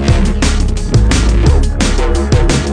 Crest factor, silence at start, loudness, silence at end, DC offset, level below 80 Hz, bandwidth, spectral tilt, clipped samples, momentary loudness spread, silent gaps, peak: 10 dB; 0 s; -13 LUFS; 0 s; under 0.1%; -12 dBFS; 10 kHz; -5.5 dB/octave; under 0.1%; 3 LU; none; 0 dBFS